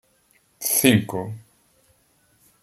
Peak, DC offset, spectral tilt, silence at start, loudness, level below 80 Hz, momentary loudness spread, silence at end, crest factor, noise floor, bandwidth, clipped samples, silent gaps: -2 dBFS; under 0.1%; -4 dB/octave; 0.6 s; -20 LUFS; -60 dBFS; 19 LU; 1.25 s; 24 dB; -62 dBFS; 16.5 kHz; under 0.1%; none